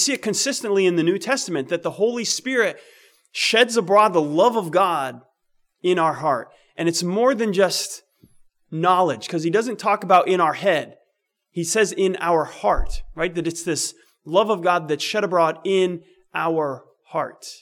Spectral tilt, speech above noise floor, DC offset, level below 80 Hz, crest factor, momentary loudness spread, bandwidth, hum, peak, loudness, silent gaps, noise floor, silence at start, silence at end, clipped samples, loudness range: -3.5 dB/octave; 53 dB; under 0.1%; -42 dBFS; 16 dB; 11 LU; 17.5 kHz; none; -4 dBFS; -21 LUFS; none; -73 dBFS; 0 s; 0.05 s; under 0.1%; 3 LU